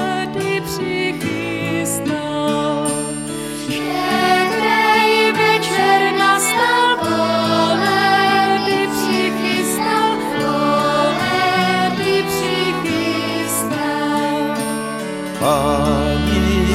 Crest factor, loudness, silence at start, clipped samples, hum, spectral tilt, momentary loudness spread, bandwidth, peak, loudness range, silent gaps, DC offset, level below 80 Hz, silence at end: 14 dB; -17 LUFS; 0 s; under 0.1%; none; -4 dB/octave; 8 LU; 16.5 kHz; -2 dBFS; 5 LU; none; under 0.1%; -36 dBFS; 0 s